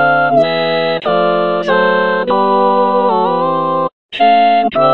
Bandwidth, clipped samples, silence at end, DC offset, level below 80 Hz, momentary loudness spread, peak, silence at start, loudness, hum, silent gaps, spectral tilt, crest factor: 6.2 kHz; under 0.1%; 0 s; 1%; -56 dBFS; 4 LU; 0 dBFS; 0 s; -12 LUFS; none; 3.93-4.09 s; -7 dB/octave; 12 dB